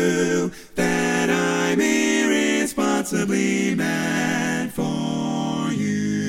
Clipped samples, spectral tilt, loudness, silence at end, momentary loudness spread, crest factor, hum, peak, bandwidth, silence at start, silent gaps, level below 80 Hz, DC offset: under 0.1%; -4.5 dB/octave; -21 LUFS; 0 s; 6 LU; 14 dB; none; -6 dBFS; 16.5 kHz; 0 s; none; -54 dBFS; under 0.1%